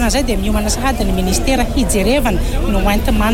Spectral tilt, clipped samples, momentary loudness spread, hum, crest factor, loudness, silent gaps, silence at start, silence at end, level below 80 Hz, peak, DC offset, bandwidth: -4.5 dB/octave; under 0.1%; 3 LU; none; 10 dB; -16 LUFS; none; 0 s; 0 s; -18 dBFS; -4 dBFS; under 0.1%; 16.5 kHz